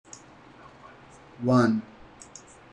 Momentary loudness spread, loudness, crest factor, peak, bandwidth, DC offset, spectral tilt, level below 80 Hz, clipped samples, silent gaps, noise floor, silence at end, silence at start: 27 LU; -24 LUFS; 20 dB; -10 dBFS; 10.5 kHz; under 0.1%; -7 dB/octave; -62 dBFS; under 0.1%; none; -51 dBFS; 0.9 s; 1.4 s